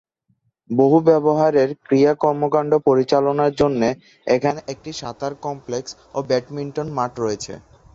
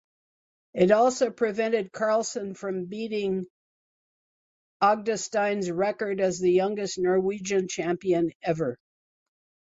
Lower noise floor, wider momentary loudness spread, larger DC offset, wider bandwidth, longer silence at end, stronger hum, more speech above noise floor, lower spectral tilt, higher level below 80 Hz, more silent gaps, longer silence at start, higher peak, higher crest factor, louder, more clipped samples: second, -67 dBFS vs under -90 dBFS; first, 14 LU vs 10 LU; neither; about the same, 7.8 kHz vs 8 kHz; second, 0.35 s vs 1 s; neither; second, 48 dB vs over 65 dB; first, -6.5 dB/octave vs -5 dB/octave; first, -54 dBFS vs -68 dBFS; second, none vs 3.50-4.80 s, 8.35-8.40 s; about the same, 0.7 s vs 0.75 s; first, -2 dBFS vs -8 dBFS; about the same, 16 dB vs 18 dB; first, -19 LUFS vs -26 LUFS; neither